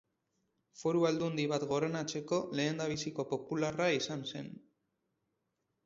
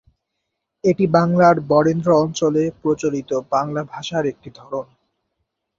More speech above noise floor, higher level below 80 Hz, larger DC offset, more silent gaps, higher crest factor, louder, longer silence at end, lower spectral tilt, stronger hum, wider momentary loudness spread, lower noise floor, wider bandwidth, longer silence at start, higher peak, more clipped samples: second, 49 dB vs 59 dB; second, -72 dBFS vs -58 dBFS; neither; neither; about the same, 18 dB vs 18 dB; second, -35 LUFS vs -18 LUFS; first, 1.3 s vs 0.95 s; second, -4.5 dB/octave vs -6.5 dB/octave; neither; second, 7 LU vs 15 LU; first, -83 dBFS vs -77 dBFS; about the same, 7.6 kHz vs 7.6 kHz; about the same, 0.75 s vs 0.85 s; second, -18 dBFS vs -2 dBFS; neither